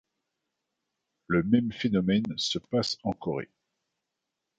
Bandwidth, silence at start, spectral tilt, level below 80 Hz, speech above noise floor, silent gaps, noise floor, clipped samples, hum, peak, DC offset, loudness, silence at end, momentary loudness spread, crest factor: 9 kHz; 1.3 s; -5.5 dB/octave; -58 dBFS; 58 dB; none; -85 dBFS; under 0.1%; none; -10 dBFS; under 0.1%; -28 LUFS; 1.15 s; 9 LU; 20 dB